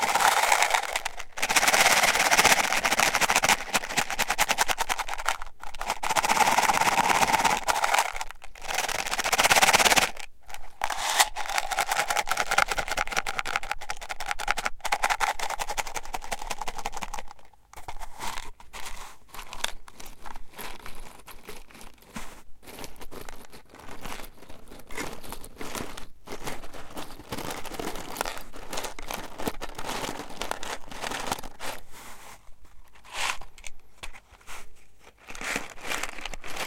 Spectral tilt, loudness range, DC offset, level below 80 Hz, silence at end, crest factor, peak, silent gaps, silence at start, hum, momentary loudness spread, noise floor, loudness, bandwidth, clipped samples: -0.5 dB/octave; 19 LU; under 0.1%; -44 dBFS; 0 s; 26 dB; -2 dBFS; none; 0 s; none; 24 LU; -49 dBFS; -25 LUFS; 17 kHz; under 0.1%